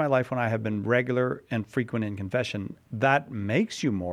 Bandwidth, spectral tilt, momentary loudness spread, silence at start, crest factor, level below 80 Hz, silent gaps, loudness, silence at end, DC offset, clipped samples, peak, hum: 13.5 kHz; -6.5 dB/octave; 7 LU; 0 s; 20 dB; -64 dBFS; none; -27 LUFS; 0 s; under 0.1%; under 0.1%; -6 dBFS; none